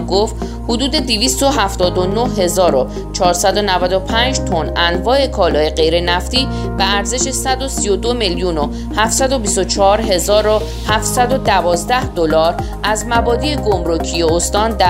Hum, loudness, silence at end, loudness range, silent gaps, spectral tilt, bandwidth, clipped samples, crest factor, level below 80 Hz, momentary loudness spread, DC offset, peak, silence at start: none; -15 LUFS; 0 s; 1 LU; none; -3.5 dB/octave; 16 kHz; under 0.1%; 14 dB; -26 dBFS; 5 LU; under 0.1%; 0 dBFS; 0 s